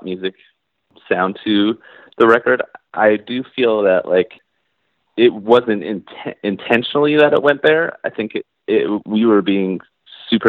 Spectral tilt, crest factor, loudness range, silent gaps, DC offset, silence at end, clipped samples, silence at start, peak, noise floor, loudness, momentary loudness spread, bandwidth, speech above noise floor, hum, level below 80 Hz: -7.5 dB/octave; 16 dB; 2 LU; none; under 0.1%; 0 s; under 0.1%; 0.05 s; 0 dBFS; -69 dBFS; -16 LUFS; 13 LU; 4.8 kHz; 53 dB; none; -62 dBFS